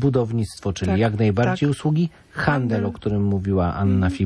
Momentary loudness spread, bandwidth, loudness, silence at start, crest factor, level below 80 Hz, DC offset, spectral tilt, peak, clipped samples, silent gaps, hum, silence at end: 5 LU; 11 kHz; -22 LUFS; 0 s; 14 dB; -42 dBFS; under 0.1%; -7.5 dB/octave; -6 dBFS; under 0.1%; none; none; 0 s